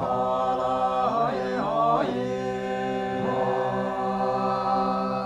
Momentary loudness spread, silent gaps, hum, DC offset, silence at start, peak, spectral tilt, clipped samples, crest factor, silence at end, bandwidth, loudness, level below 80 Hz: 5 LU; none; none; under 0.1%; 0 s; -12 dBFS; -7 dB/octave; under 0.1%; 14 dB; 0 s; 12 kHz; -25 LUFS; -54 dBFS